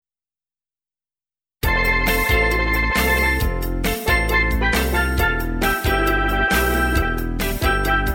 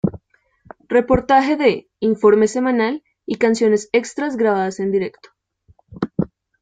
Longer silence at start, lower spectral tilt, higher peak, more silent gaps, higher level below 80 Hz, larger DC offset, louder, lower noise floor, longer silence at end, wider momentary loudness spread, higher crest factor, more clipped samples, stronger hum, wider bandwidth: first, 1.65 s vs 0.05 s; second, -4.5 dB/octave vs -6 dB/octave; about the same, -4 dBFS vs -2 dBFS; neither; first, -24 dBFS vs -46 dBFS; neither; about the same, -19 LUFS vs -18 LUFS; first, under -90 dBFS vs -57 dBFS; second, 0 s vs 0.35 s; second, 6 LU vs 12 LU; about the same, 16 dB vs 18 dB; neither; neither; first, over 20 kHz vs 9.4 kHz